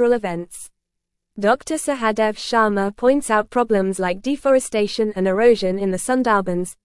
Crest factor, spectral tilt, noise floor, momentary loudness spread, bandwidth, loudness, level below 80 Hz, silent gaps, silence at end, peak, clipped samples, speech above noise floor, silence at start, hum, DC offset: 16 dB; -5 dB/octave; -78 dBFS; 7 LU; 12 kHz; -19 LUFS; -50 dBFS; none; 0.1 s; -2 dBFS; under 0.1%; 60 dB; 0 s; none; under 0.1%